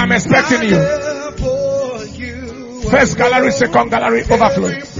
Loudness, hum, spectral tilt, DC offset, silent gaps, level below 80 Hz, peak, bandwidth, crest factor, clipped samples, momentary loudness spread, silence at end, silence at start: -14 LUFS; none; -5 dB/octave; under 0.1%; none; -34 dBFS; 0 dBFS; 7.6 kHz; 14 dB; under 0.1%; 14 LU; 0 s; 0 s